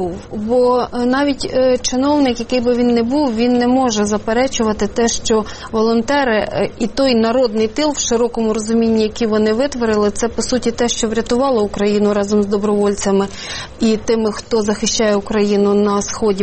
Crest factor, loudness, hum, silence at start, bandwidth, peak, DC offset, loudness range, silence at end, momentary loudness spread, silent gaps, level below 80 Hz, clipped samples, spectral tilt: 12 dB; -16 LUFS; none; 0 s; 8.8 kHz; -4 dBFS; under 0.1%; 1 LU; 0 s; 4 LU; none; -38 dBFS; under 0.1%; -4.5 dB/octave